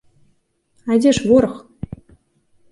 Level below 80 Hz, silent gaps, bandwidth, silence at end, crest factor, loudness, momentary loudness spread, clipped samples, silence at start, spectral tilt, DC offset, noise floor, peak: -46 dBFS; none; 11.5 kHz; 1.15 s; 18 dB; -16 LUFS; 20 LU; under 0.1%; 0.85 s; -5.5 dB/octave; under 0.1%; -62 dBFS; -2 dBFS